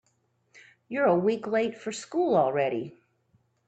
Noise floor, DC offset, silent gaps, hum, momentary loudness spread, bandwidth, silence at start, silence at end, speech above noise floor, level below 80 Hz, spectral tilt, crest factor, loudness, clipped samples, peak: -71 dBFS; under 0.1%; none; none; 12 LU; 9 kHz; 0.55 s; 0.8 s; 45 dB; -76 dBFS; -6 dB/octave; 18 dB; -27 LUFS; under 0.1%; -10 dBFS